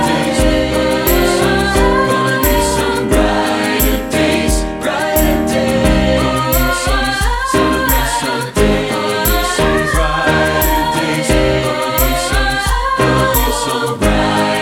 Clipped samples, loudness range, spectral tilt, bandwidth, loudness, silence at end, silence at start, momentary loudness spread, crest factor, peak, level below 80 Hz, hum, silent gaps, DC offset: under 0.1%; 1 LU; -4.5 dB/octave; 19 kHz; -14 LUFS; 0 s; 0 s; 3 LU; 12 dB; 0 dBFS; -22 dBFS; none; none; under 0.1%